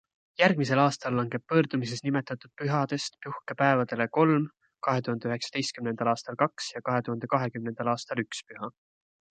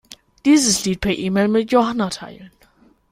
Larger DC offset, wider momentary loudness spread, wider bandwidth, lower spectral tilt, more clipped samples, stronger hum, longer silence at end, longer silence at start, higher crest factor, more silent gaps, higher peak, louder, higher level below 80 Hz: neither; about the same, 13 LU vs 11 LU; second, 9.4 kHz vs 16 kHz; first, -5.5 dB/octave vs -4 dB/octave; neither; neither; about the same, 0.7 s vs 0.65 s; about the same, 0.4 s vs 0.45 s; first, 22 dB vs 16 dB; neither; second, -8 dBFS vs -2 dBFS; second, -28 LUFS vs -18 LUFS; second, -72 dBFS vs -46 dBFS